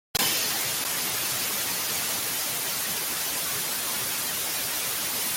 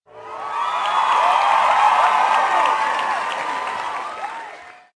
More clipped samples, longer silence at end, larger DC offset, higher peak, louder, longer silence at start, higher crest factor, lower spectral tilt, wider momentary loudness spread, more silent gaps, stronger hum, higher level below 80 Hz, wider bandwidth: neither; second, 0 s vs 0.25 s; neither; second, -12 dBFS vs -4 dBFS; second, -25 LUFS vs -18 LUFS; about the same, 0.15 s vs 0.15 s; about the same, 16 dB vs 16 dB; about the same, 0 dB/octave vs -1 dB/octave; second, 2 LU vs 15 LU; neither; neither; about the same, -62 dBFS vs -64 dBFS; first, 17 kHz vs 10.5 kHz